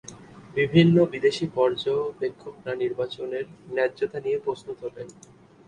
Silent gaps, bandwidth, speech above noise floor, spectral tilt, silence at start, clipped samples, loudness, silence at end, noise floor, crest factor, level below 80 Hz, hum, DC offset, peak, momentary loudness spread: none; 10 kHz; 20 dB; -7 dB/octave; 0.05 s; under 0.1%; -25 LUFS; 0.55 s; -45 dBFS; 22 dB; -60 dBFS; none; under 0.1%; -4 dBFS; 17 LU